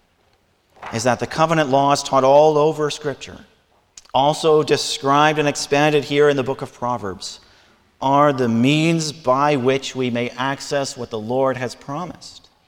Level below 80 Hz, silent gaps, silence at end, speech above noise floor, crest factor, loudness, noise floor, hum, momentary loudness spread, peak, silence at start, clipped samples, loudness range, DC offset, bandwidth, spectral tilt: -56 dBFS; none; 0.35 s; 42 dB; 18 dB; -18 LUFS; -61 dBFS; none; 14 LU; -2 dBFS; 0.8 s; under 0.1%; 2 LU; under 0.1%; 16.5 kHz; -5 dB/octave